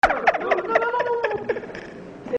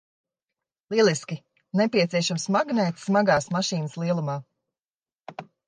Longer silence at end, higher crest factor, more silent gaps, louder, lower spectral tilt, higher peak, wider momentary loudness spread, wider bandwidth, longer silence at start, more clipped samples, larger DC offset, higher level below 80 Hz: second, 0 s vs 0.25 s; about the same, 20 dB vs 18 dB; second, none vs 4.87-4.91 s; about the same, -22 LUFS vs -24 LUFS; about the same, -5 dB/octave vs -5 dB/octave; first, -4 dBFS vs -8 dBFS; about the same, 17 LU vs 15 LU; about the same, 9.4 kHz vs 10 kHz; second, 0.05 s vs 0.9 s; neither; neither; first, -50 dBFS vs -68 dBFS